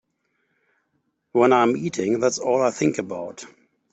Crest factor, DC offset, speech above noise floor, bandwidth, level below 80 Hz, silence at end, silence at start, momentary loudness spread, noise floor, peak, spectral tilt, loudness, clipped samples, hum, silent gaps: 20 dB; under 0.1%; 51 dB; 8.2 kHz; -66 dBFS; 0.45 s; 1.35 s; 15 LU; -72 dBFS; -4 dBFS; -5 dB/octave; -21 LUFS; under 0.1%; none; none